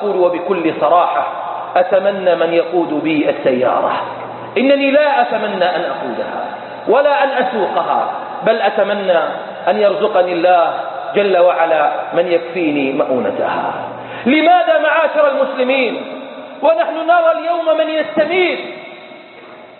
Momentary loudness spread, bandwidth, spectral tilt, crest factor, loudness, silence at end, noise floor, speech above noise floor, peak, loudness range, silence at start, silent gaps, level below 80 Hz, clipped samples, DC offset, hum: 10 LU; 4.3 kHz; -10 dB/octave; 14 dB; -15 LUFS; 0.1 s; -37 dBFS; 23 dB; 0 dBFS; 2 LU; 0 s; none; -64 dBFS; under 0.1%; under 0.1%; none